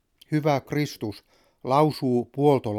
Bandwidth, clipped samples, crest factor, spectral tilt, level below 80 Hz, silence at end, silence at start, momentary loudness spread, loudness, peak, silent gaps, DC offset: 16 kHz; under 0.1%; 18 dB; -7 dB/octave; -64 dBFS; 0 s; 0.3 s; 12 LU; -24 LUFS; -6 dBFS; none; under 0.1%